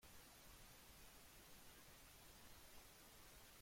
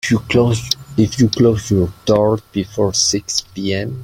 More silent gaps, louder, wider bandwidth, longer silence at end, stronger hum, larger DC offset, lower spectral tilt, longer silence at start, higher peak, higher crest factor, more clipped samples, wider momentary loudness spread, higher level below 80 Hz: neither; second, -63 LUFS vs -16 LUFS; about the same, 16.5 kHz vs 16.5 kHz; about the same, 0 s vs 0 s; neither; neither; second, -2 dB/octave vs -4.5 dB/octave; about the same, 0 s vs 0.05 s; second, -50 dBFS vs 0 dBFS; about the same, 14 dB vs 16 dB; neither; second, 0 LU vs 7 LU; second, -72 dBFS vs -42 dBFS